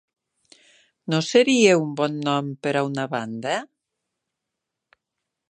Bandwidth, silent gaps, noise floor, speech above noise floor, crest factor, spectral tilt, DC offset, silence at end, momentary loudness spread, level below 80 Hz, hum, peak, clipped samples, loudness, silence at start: 10 kHz; none; -83 dBFS; 62 dB; 22 dB; -4.5 dB/octave; under 0.1%; 1.85 s; 12 LU; -76 dBFS; none; -2 dBFS; under 0.1%; -22 LUFS; 1.05 s